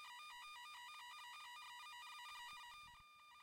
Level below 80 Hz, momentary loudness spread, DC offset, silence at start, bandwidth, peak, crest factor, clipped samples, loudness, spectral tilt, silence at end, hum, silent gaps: -84 dBFS; 6 LU; under 0.1%; 0 s; 16 kHz; -44 dBFS; 12 dB; under 0.1%; -55 LUFS; 2 dB/octave; 0 s; none; none